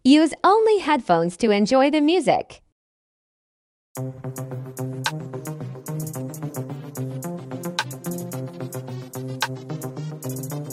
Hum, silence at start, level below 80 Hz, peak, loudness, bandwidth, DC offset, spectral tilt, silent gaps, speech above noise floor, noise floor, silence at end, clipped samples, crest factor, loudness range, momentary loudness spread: none; 0.05 s; -62 dBFS; -4 dBFS; -24 LUFS; 16 kHz; under 0.1%; -5.5 dB/octave; 2.72-3.95 s; over 70 dB; under -90 dBFS; 0 s; under 0.1%; 20 dB; 12 LU; 16 LU